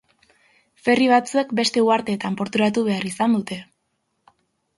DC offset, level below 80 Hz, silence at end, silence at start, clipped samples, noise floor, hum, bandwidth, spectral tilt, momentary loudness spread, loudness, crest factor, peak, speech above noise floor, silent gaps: under 0.1%; -64 dBFS; 1.15 s; 0.85 s; under 0.1%; -73 dBFS; none; 11.5 kHz; -4.5 dB/octave; 9 LU; -20 LUFS; 18 dB; -4 dBFS; 53 dB; none